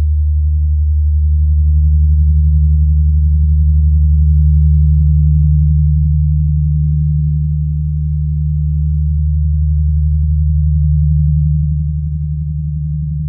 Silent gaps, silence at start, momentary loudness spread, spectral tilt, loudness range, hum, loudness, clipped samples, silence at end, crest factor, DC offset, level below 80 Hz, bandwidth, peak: none; 0 s; 6 LU; -30.5 dB/octave; 4 LU; none; -14 LUFS; under 0.1%; 0 s; 8 dB; under 0.1%; -14 dBFS; 0.3 kHz; -4 dBFS